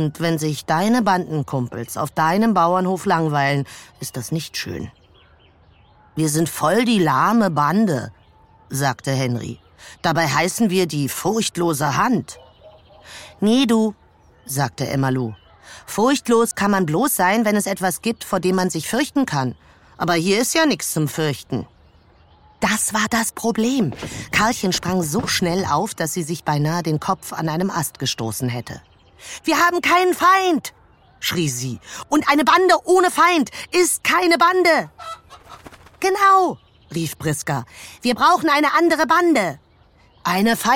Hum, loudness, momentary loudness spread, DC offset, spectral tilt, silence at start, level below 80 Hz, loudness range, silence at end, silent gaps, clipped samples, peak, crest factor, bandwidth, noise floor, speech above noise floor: none; -19 LUFS; 14 LU; under 0.1%; -4.5 dB/octave; 0 s; -54 dBFS; 5 LU; 0 s; none; under 0.1%; -2 dBFS; 16 dB; 17 kHz; -53 dBFS; 34 dB